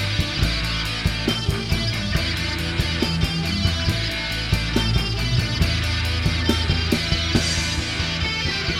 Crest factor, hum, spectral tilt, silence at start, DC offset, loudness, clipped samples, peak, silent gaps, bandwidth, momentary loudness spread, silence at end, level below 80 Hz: 18 dB; none; -4.5 dB/octave; 0 s; 0.2%; -22 LUFS; under 0.1%; -4 dBFS; none; 16.5 kHz; 3 LU; 0 s; -28 dBFS